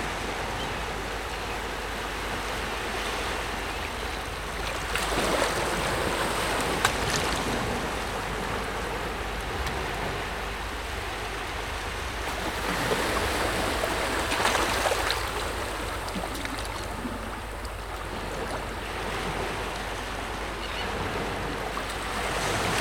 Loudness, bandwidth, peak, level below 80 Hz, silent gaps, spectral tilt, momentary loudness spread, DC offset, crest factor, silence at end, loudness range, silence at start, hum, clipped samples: -29 LUFS; 18 kHz; -4 dBFS; -40 dBFS; none; -3.5 dB/octave; 8 LU; 0.2%; 26 dB; 0 s; 6 LU; 0 s; none; under 0.1%